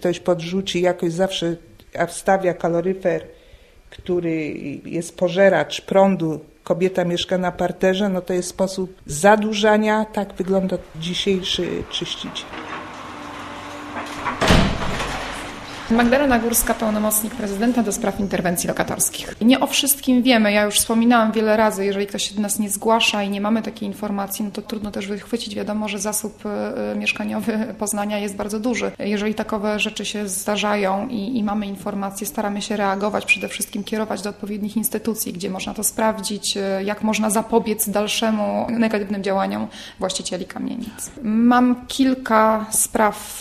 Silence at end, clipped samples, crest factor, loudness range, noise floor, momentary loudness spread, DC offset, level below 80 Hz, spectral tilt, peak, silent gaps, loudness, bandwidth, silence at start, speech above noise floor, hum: 0 s; under 0.1%; 20 dB; 6 LU; -48 dBFS; 12 LU; under 0.1%; -42 dBFS; -4 dB/octave; 0 dBFS; none; -20 LUFS; 14 kHz; 0 s; 27 dB; none